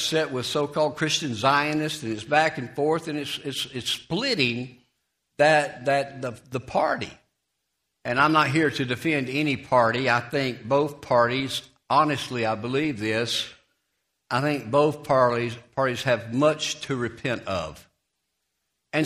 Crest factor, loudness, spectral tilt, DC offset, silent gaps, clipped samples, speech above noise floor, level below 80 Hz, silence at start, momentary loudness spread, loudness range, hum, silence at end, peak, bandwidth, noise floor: 20 dB; -24 LUFS; -4.5 dB/octave; under 0.1%; none; under 0.1%; 54 dB; -60 dBFS; 0 s; 9 LU; 3 LU; none; 0 s; -4 dBFS; 15.5 kHz; -78 dBFS